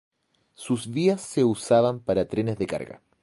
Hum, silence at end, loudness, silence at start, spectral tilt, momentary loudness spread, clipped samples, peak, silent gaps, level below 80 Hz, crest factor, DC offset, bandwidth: none; 0.25 s; -25 LUFS; 0.6 s; -6 dB/octave; 11 LU; under 0.1%; -6 dBFS; none; -56 dBFS; 18 dB; under 0.1%; 11.5 kHz